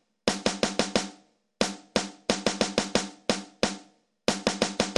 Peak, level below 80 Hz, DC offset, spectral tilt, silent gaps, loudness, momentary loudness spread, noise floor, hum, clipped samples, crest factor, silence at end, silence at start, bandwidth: -6 dBFS; -54 dBFS; under 0.1%; -3 dB/octave; none; -28 LUFS; 4 LU; -58 dBFS; none; under 0.1%; 22 dB; 0 s; 0.25 s; 13.5 kHz